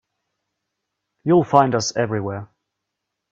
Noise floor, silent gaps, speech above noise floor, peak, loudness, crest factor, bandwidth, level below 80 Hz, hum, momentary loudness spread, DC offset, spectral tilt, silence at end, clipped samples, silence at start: -80 dBFS; none; 62 dB; 0 dBFS; -19 LUFS; 22 dB; 7.8 kHz; -60 dBFS; none; 14 LU; under 0.1%; -5.5 dB/octave; 0.85 s; under 0.1%; 1.25 s